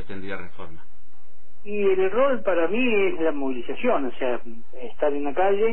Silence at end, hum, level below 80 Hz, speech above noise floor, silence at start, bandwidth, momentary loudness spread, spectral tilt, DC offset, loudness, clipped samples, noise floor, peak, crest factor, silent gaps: 0 s; none; -58 dBFS; 31 dB; 0 s; 4.2 kHz; 20 LU; -9 dB/octave; 8%; -24 LUFS; under 0.1%; -55 dBFS; -8 dBFS; 14 dB; none